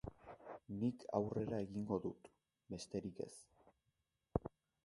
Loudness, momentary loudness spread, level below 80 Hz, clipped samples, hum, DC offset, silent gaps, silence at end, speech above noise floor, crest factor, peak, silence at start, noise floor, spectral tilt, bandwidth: -45 LUFS; 15 LU; -64 dBFS; under 0.1%; none; under 0.1%; none; 0.4 s; 43 dB; 28 dB; -18 dBFS; 0.05 s; -86 dBFS; -7.5 dB/octave; 11.5 kHz